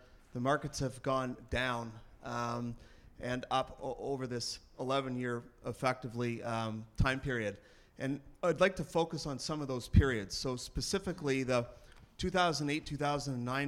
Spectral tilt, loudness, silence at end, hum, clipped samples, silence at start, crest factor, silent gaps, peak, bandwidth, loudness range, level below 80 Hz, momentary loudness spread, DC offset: -5 dB/octave; -36 LUFS; 0 s; none; under 0.1%; 0.15 s; 24 dB; none; -12 dBFS; 16 kHz; 4 LU; -48 dBFS; 10 LU; under 0.1%